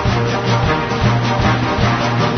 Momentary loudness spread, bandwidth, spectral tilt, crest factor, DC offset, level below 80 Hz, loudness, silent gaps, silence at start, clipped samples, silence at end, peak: 1 LU; 6.6 kHz; -6 dB/octave; 12 dB; under 0.1%; -30 dBFS; -16 LUFS; none; 0 s; under 0.1%; 0 s; -4 dBFS